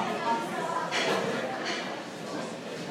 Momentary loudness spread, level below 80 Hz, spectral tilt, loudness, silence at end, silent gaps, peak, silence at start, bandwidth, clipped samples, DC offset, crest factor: 9 LU; -78 dBFS; -3.5 dB/octave; -31 LUFS; 0 s; none; -14 dBFS; 0 s; 16 kHz; under 0.1%; under 0.1%; 18 dB